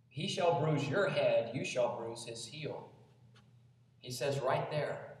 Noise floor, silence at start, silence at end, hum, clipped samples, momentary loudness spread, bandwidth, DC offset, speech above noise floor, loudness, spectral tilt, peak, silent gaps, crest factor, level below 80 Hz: -64 dBFS; 0.15 s; 0.05 s; none; under 0.1%; 12 LU; 13.5 kHz; under 0.1%; 29 dB; -35 LUFS; -5 dB/octave; -18 dBFS; none; 18 dB; -78 dBFS